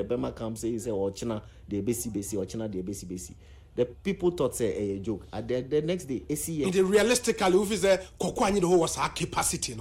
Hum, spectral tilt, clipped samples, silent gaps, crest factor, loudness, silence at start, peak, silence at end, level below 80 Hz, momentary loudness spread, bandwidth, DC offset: none; -4.5 dB/octave; under 0.1%; none; 16 dB; -28 LUFS; 0 s; -12 dBFS; 0 s; -50 dBFS; 12 LU; 16 kHz; under 0.1%